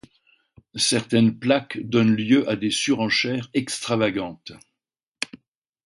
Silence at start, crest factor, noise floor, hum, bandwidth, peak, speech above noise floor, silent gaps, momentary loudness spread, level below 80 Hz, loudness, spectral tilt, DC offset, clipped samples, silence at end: 0.75 s; 20 dB; -85 dBFS; none; 11.5 kHz; -4 dBFS; 64 dB; 5.07-5.12 s; 13 LU; -60 dBFS; -22 LUFS; -4.5 dB/octave; under 0.1%; under 0.1%; 0.6 s